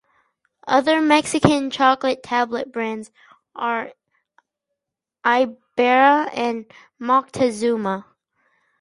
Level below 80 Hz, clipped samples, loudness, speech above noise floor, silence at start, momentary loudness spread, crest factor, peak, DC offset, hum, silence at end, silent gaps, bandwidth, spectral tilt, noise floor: -58 dBFS; under 0.1%; -19 LUFS; 65 dB; 0.65 s; 12 LU; 20 dB; 0 dBFS; under 0.1%; none; 0.8 s; none; 11.5 kHz; -4.5 dB/octave; -84 dBFS